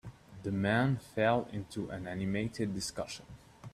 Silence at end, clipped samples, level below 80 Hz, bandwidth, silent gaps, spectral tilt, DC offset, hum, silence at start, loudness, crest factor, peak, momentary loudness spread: 0.05 s; under 0.1%; -60 dBFS; 14.5 kHz; none; -5.5 dB/octave; under 0.1%; none; 0.05 s; -34 LUFS; 20 dB; -16 dBFS; 15 LU